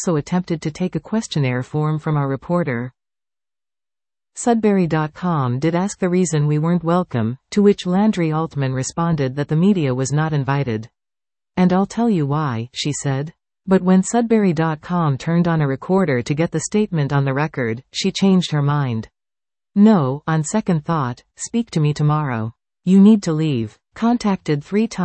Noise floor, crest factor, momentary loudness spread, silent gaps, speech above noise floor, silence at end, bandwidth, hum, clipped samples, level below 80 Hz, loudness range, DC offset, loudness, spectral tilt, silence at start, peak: under -90 dBFS; 16 dB; 8 LU; none; over 72 dB; 0 s; 8.8 kHz; none; under 0.1%; -52 dBFS; 4 LU; under 0.1%; -19 LUFS; -6.5 dB/octave; 0 s; -2 dBFS